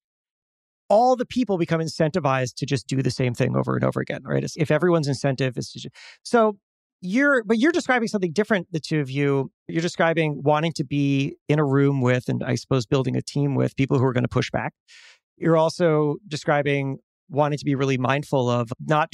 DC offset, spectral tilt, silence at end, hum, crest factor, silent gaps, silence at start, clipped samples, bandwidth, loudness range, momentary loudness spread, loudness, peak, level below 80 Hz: under 0.1%; -6.5 dB/octave; 0.05 s; none; 18 dB; 6.63-6.99 s, 9.54-9.66 s, 11.41-11.46 s, 14.80-14.86 s, 15.23-15.37 s, 17.03-17.27 s; 0.9 s; under 0.1%; 12 kHz; 2 LU; 7 LU; -23 LUFS; -4 dBFS; -58 dBFS